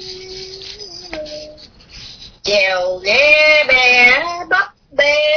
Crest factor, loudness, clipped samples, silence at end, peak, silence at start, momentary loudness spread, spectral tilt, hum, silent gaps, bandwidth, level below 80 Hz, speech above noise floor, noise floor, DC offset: 16 dB; -11 LUFS; under 0.1%; 0 s; 0 dBFS; 0 s; 21 LU; -1.5 dB/octave; none; none; 5.4 kHz; -46 dBFS; 27 dB; -39 dBFS; under 0.1%